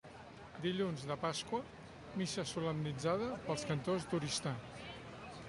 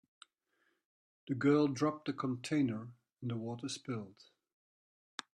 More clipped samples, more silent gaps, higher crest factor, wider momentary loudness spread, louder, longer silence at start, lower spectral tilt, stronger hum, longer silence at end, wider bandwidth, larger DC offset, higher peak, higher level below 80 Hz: neither; neither; about the same, 18 dB vs 20 dB; second, 13 LU vs 18 LU; second, -40 LUFS vs -36 LUFS; second, 0.05 s vs 1.25 s; about the same, -5 dB/octave vs -6 dB/octave; neither; second, 0 s vs 1.25 s; about the same, 11.5 kHz vs 10.5 kHz; neither; second, -22 dBFS vs -18 dBFS; first, -66 dBFS vs -80 dBFS